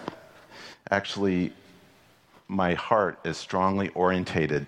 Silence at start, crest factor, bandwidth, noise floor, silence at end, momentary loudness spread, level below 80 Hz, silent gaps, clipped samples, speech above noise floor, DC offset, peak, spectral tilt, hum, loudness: 0 s; 22 dB; 10.5 kHz; -58 dBFS; 0 s; 14 LU; -58 dBFS; none; under 0.1%; 32 dB; under 0.1%; -6 dBFS; -6 dB/octave; none; -27 LUFS